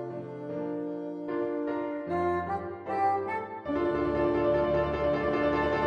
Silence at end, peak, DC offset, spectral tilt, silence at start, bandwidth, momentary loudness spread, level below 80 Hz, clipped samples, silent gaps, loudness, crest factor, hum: 0 s; -14 dBFS; under 0.1%; -8 dB/octave; 0 s; 7 kHz; 9 LU; -50 dBFS; under 0.1%; none; -30 LUFS; 14 dB; none